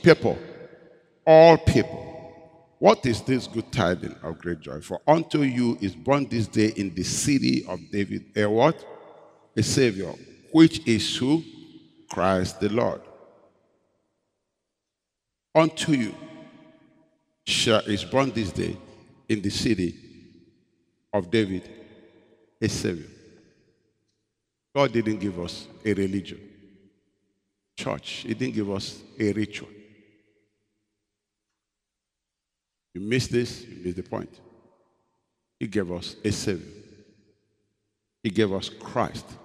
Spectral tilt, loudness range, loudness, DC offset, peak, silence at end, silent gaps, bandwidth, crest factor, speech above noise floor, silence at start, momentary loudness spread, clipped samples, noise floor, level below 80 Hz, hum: -5.5 dB/octave; 10 LU; -24 LUFS; under 0.1%; 0 dBFS; 0.1 s; none; 14.5 kHz; 26 dB; 62 dB; 0.05 s; 16 LU; under 0.1%; -85 dBFS; -52 dBFS; none